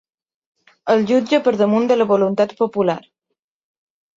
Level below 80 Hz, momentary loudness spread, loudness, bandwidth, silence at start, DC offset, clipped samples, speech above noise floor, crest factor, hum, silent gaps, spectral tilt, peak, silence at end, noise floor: -64 dBFS; 5 LU; -17 LUFS; 7.8 kHz; 0.85 s; under 0.1%; under 0.1%; 62 dB; 16 dB; none; none; -6.5 dB/octave; -4 dBFS; 1.15 s; -78 dBFS